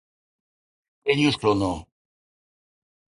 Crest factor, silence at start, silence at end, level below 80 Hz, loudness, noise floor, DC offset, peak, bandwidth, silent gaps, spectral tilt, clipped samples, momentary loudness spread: 22 dB; 1.05 s; 1.3 s; -52 dBFS; -23 LUFS; under -90 dBFS; under 0.1%; -6 dBFS; 11 kHz; none; -5.5 dB/octave; under 0.1%; 10 LU